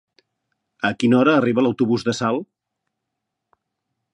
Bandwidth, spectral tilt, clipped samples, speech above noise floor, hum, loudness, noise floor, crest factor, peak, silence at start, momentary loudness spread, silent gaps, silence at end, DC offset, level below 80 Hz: 9.8 kHz; -6 dB/octave; under 0.1%; 62 dB; none; -19 LUFS; -80 dBFS; 20 dB; -2 dBFS; 0.85 s; 9 LU; none; 1.7 s; under 0.1%; -64 dBFS